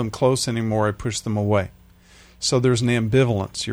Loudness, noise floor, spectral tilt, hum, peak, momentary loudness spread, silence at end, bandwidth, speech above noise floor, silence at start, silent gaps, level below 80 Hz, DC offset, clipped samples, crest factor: -21 LUFS; -50 dBFS; -5.5 dB/octave; none; -6 dBFS; 6 LU; 0 s; over 20 kHz; 29 dB; 0 s; none; -48 dBFS; under 0.1%; under 0.1%; 16 dB